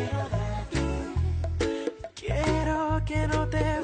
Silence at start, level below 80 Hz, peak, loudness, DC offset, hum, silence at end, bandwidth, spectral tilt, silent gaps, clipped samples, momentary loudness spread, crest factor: 0 s; -34 dBFS; -14 dBFS; -29 LUFS; under 0.1%; none; 0 s; 9.4 kHz; -6.5 dB/octave; none; under 0.1%; 5 LU; 12 dB